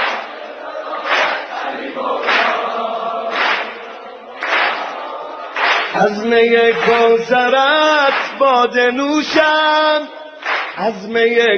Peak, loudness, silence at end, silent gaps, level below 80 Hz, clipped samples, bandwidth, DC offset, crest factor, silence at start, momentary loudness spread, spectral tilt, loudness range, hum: 0 dBFS; -15 LUFS; 0 s; none; -60 dBFS; under 0.1%; 8 kHz; under 0.1%; 14 dB; 0 s; 14 LU; -3.5 dB/octave; 6 LU; none